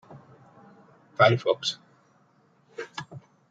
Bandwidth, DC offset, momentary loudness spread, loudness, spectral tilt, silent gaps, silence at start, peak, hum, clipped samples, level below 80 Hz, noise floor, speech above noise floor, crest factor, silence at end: 9 kHz; under 0.1%; 25 LU; -25 LUFS; -5 dB/octave; none; 0.1 s; -4 dBFS; none; under 0.1%; -74 dBFS; -63 dBFS; 39 dB; 26 dB; 0.3 s